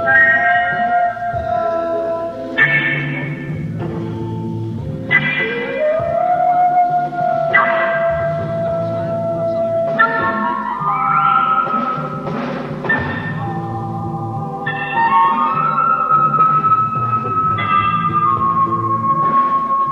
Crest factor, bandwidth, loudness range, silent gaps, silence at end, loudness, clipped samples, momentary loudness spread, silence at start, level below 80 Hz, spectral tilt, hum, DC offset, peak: 16 dB; 7 kHz; 5 LU; none; 0 s; -16 LUFS; under 0.1%; 11 LU; 0 s; -46 dBFS; -7.5 dB/octave; none; under 0.1%; -2 dBFS